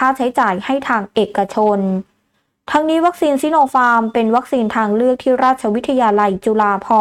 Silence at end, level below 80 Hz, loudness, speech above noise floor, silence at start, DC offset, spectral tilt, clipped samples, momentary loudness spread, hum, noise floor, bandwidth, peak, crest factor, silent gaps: 0 s; -54 dBFS; -15 LUFS; 51 dB; 0 s; under 0.1%; -6 dB/octave; under 0.1%; 4 LU; none; -66 dBFS; 14.5 kHz; -4 dBFS; 12 dB; none